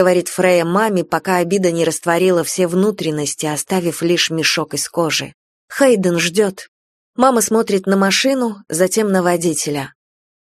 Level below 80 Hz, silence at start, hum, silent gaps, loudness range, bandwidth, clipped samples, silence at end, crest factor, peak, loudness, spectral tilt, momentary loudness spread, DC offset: -60 dBFS; 0 s; none; 5.34-5.68 s, 6.68-7.13 s; 1 LU; 13.5 kHz; under 0.1%; 0.55 s; 16 dB; 0 dBFS; -16 LUFS; -4 dB/octave; 7 LU; under 0.1%